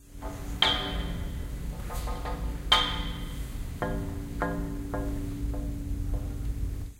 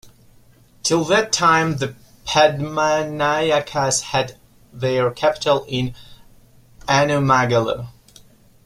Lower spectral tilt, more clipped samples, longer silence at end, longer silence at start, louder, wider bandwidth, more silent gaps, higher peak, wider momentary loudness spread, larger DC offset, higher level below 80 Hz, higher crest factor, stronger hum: about the same, -4.5 dB/octave vs -4 dB/octave; neither; second, 0 s vs 0.75 s; about the same, 0 s vs 0.05 s; second, -31 LUFS vs -19 LUFS; about the same, 16 kHz vs 16 kHz; neither; second, -6 dBFS vs -2 dBFS; first, 14 LU vs 11 LU; neither; first, -34 dBFS vs -50 dBFS; first, 26 dB vs 18 dB; neither